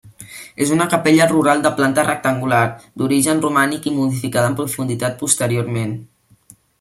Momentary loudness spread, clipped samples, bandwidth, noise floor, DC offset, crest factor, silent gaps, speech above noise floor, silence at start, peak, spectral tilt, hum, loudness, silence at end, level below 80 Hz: 10 LU; under 0.1%; 16 kHz; -49 dBFS; under 0.1%; 18 dB; none; 33 dB; 0.05 s; 0 dBFS; -4.5 dB/octave; none; -17 LUFS; 0.75 s; -56 dBFS